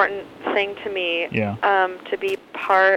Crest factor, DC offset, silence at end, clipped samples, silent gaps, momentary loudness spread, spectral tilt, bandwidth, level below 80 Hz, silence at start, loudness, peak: 16 dB; under 0.1%; 0 s; under 0.1%; none; 7 LU; -5.5 dB/octave; 15.5 kHz; -62 dBFS; 0 s; -22 LUFS; -4 dBFS